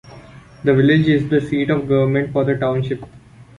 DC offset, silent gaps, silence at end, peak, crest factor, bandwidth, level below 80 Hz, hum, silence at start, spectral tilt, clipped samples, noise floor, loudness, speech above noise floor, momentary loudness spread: under 0.1%; none; 0.15 s; -4 dBFS; 14 dB; 10 kHz; -48 dBFS; none; 0.05 s; -8.5 dB/octave; under 0.1%; -41 dBFS; -17 LUFS; 24 dB; 9 LU